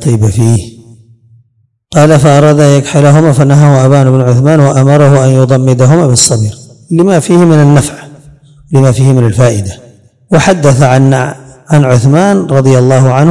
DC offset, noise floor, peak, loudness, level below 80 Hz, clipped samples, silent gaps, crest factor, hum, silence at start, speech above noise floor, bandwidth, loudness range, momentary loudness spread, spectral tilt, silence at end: 0.9%; -54 dBFS; 0 dBFS; -6 LUFS; -38 dBFS; 10%; none; 6 dB; none; 0 s; 49 dB; 12 kHz; 3 LU; 7 LU; -6.5 dB/octave; 0 s